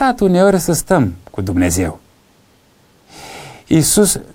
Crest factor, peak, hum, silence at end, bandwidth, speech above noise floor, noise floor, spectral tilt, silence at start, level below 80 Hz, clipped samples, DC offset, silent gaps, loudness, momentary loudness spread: 14 dB; 0 dBFS; none; 0.1 s; 16.5 kHz; 38 dB; -52 dBFS; -5 dB/octave; 0 s; -38 dBFS; under 0.1%; under 0.1%; none; -14 LUFS; 21 LU